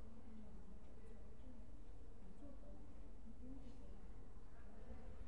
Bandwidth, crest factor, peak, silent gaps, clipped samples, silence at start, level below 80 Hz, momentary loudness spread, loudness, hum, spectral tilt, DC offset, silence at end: 10.5 kHz; 14 dB; -40 dBFS; none; under 0.1%; 0 s; -60 dBFS; 4 LU; -62 LUFS; none; -7.5 dB/octave; 0.4%; 0 s